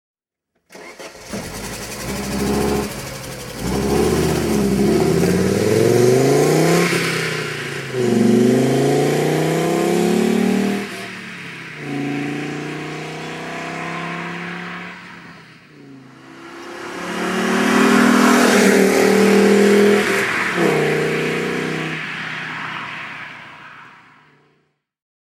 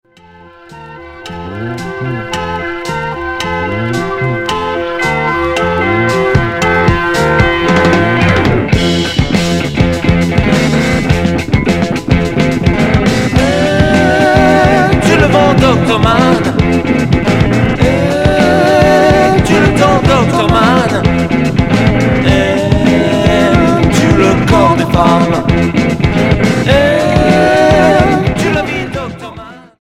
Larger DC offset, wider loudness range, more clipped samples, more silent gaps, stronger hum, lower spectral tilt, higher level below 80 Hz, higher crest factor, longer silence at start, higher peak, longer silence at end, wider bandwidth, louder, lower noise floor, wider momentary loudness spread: neither; first, 15 LU vs 6 LU; second, under 0.1% vs 0.4%; neither; neither; about the same, -5 dB/octave vs -6 dB/octave; second, -42 dBFS vs -24 dBFS; first, 18 dB vs 10 dB; about the same, 0.7 s vs 0.7 s; about the same, 0 dBFS vs 0 dBFS; first, 1.45 s vs 0.2 s; first, 17 kHz vs 15 kHz; second, -17 LUFS vs -10 LUFS; first, -72 dBFS vs -39 dBFS; first, 18 LU vs 10 LU